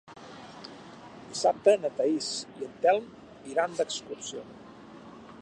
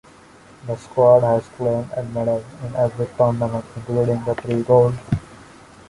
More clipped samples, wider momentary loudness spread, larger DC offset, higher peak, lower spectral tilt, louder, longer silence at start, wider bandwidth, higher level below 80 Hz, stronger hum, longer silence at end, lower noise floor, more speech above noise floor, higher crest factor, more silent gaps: neither; first, 24 LU vs 12 LU; neither; second, -10 dBFS vs -2 dBFS; second, -3 dB/octave vs -8.5 dB/octave; second, -29 LUFS vs -20 LUFS; second, 0.1 s vs 0.65 s; about the same, 11 kHz vs 11.5 kHz; second, -70 dBFS vs -48 dBFS; neither; second, 0 s vs 0.55 s; about the same, -48 dBFS vs -46 dBFS; second, 20 dB vs 27 dB; about the same, 22 dB vs 18 dB; neither